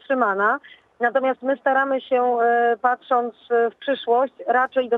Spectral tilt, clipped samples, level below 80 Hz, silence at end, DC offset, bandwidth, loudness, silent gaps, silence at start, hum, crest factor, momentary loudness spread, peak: -6 dB/octave; under 0.1%; -78 dBFS; 0 s; under 0.1%; 4.1 kHz; -21 LUFS; none; 0.1 s; none; 16 dB; 4 LU; -6 dBFS